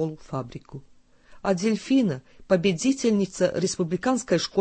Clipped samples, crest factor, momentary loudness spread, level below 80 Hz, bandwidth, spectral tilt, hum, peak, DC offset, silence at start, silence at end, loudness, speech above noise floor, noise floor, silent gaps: under 0.1%; 18 dB; 14 LU; -56 dBFS; 8.8 kHz; -5 dB/octave; none; -6 dBFS; under 0.1%; 0 s; 0 s; -25 LUFS; 26 dB; -50 dBFS; none